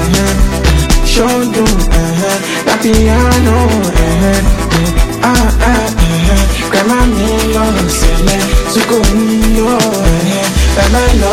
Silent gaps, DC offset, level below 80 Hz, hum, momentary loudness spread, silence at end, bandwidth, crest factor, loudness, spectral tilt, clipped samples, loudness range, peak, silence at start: none; under 0.1%; -12 dBFS; none; 3 LU; 0 s; 16.5 kHz; 10 dB; -11 LUFS; -5 dB/octave; 0.1%; 1 LU; 0 dBFS; 0 s